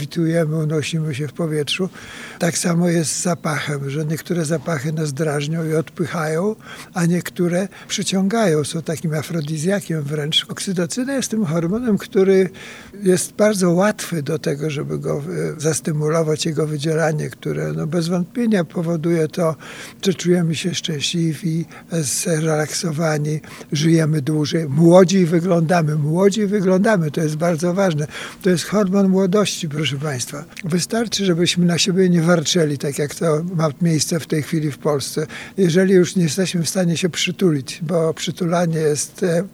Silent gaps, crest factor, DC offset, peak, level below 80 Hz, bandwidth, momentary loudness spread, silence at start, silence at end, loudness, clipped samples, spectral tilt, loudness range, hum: none; 18 dB; under 0.1%; 0 dBFS; -58 dBFS; 16 kHz; 8 LU; 0 s; 0.05 s; -19 LUFS; under 0.1%; -5 dB/octave; 5 LU; none